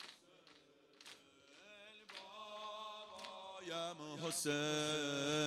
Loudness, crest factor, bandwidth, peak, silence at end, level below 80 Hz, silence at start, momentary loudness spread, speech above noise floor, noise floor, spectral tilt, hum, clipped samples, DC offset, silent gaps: -43 LUFS; 20 dB; 16 kHz; -26 dBFS; 0 s; -86 dBFS; 0 s; 23 LU; 27 dB; -67 dBFS; -3 dB/octave; none; under 0.1%; under 0.1%; none